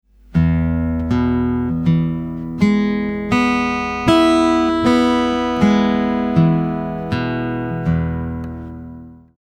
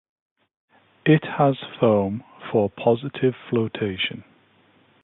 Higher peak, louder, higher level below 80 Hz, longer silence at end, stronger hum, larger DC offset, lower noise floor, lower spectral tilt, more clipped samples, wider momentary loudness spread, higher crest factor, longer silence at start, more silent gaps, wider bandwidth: first, 0 dBFS vs -4 dBFS; first, -17 LUFS vs -22 LUFS; first, -34 dBFS vs -58 dBFS; second, 0.25 s vs 0.85 s; neither; neither; second, -37 dBFS vs -58 dBFS; second, -7 dB/octave vs -11.5 dB/octave; neither; first, 10 LU vs 7 LU; about the same, 18 dB vs 20 dB; second, 0.3 s vs 1.05 s; neither; first, 10.5 kHz vs 4.1 kHz